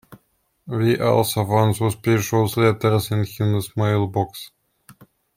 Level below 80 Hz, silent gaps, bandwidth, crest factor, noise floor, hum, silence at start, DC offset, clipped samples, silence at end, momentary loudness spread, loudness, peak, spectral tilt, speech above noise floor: -54 dBFS; none; 16.5 kHz; 16 dB; -67 dBFS; none; 0.1 s; under 0.1%; under 0.1%; 0.45 s; 8 LU; -20 LUFS; -4 dBFS; -6 dB/octave; 47 dB